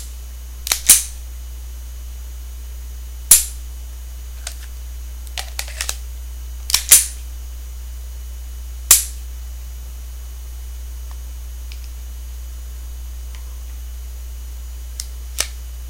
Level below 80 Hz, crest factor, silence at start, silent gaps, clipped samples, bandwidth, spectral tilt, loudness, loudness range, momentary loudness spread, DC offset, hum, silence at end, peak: -30 dBFS; 22 dB; 0 s; none; 0.1%; 17 kHz; 0 dB/octave; -15 LUFS; 17 LU; 23 LU; under 0.1%; none; 0 s; 0 dBFS